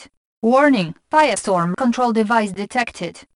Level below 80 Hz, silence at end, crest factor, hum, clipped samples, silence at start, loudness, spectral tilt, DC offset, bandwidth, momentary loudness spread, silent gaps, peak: -58 dBFS; 0.15 s; 18 dB; none; under 0.1%; 0 s; -18 LUFS; -5 dB/octave; under 0.1%; 11 kHz; 8 LU; 0.17-0.42 s; -2 dBFS